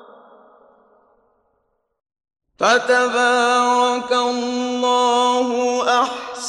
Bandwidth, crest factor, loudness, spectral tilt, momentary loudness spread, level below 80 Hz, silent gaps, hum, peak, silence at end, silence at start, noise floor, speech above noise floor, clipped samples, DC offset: 11.5 kHz; 18 dB; -17 LUFS; -1.5 dB/octave; 6 LU; -66 dBFS; none; none; -2 dBFS; 0 s; 2.6 s; -69 dBFS; 51 dB; under 0.1%; under 0.1%